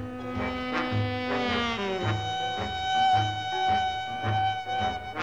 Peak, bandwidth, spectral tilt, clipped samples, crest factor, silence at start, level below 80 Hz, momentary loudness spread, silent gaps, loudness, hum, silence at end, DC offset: -14 dBFS; 9.6 kHz; -5 dB/octave; under 0.1%; 14 dB; 0 s; -50 dBFS; 6 LU; none; -28 LUFS; none; 0 s; 0.2%